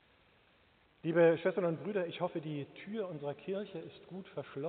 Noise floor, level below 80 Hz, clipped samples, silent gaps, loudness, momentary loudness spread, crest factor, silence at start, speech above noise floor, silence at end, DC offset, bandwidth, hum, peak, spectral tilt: -68 dBFS; -80 dBFS; under 0.1%; none; -35 LUFS; 17 LU; 20 dB; 1.05 s; 33 dB; 0 s; under 0.1%; 4.4 kHz; none; -16 dBFS; -5.5 dB/octave